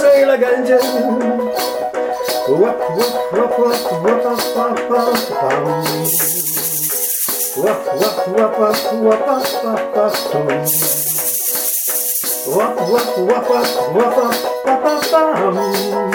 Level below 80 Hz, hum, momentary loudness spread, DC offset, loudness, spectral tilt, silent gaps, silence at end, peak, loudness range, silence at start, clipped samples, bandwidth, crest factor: -58 dBFS; none; 4 LU; under 0.1%; -15 LUFS; -3 dB/octave; none; 0 s; 0 dBFS; 1 LU; 0 s; under 0.1%; 19.5 kHz; 14 dB